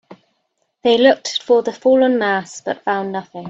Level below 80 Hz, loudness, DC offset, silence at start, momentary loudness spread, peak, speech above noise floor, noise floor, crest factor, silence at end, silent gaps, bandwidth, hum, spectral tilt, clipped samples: -64 dBFS; -17 LUFS; under 0.1%; 0.1 s; 10 LU; 0 dBFS; 53 dB; -69 dBFS; 18 dB; 0 s; none; 8 kHz; none; -4 dB/octave; under 0.1%